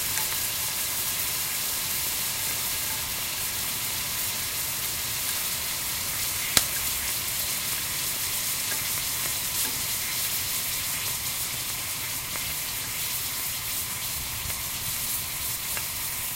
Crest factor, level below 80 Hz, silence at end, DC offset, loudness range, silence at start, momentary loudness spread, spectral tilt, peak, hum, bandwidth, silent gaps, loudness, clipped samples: 30 dB; -50 dBFS; 0 s; under 0.1%; 3 LU; 0 s; 3 LU; 0 dB/octave; 0 dBFS; none; 16 kHz; none; -26 LUFS; under 0.1%